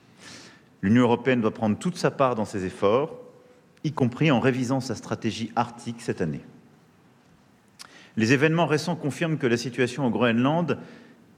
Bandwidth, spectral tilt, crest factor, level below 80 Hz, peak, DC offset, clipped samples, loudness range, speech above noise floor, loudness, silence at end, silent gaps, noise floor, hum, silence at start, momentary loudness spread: 14.5 kHz; -6 dB/octave; 20 dB; -66 dBFS; -6 dBFS; under 0.1%; under 0.1%; 6 LU; 34 dB; -25 LUFS; 0.4 s; none; -58 dBFS; none; 0.2 s; 13 LU